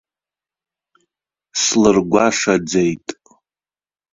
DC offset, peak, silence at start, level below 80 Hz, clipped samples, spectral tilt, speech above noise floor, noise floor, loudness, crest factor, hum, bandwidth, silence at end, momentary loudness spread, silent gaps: under 0.1%; -2 dBFS; 1.55 s; -52 dBFS; under 0.1%; -3.5 dB/octave; over 75 dB; under -90 dBFS; -16 LUFS; 18 dB; none; 7.8 kHz; 1 s; 13 LU; none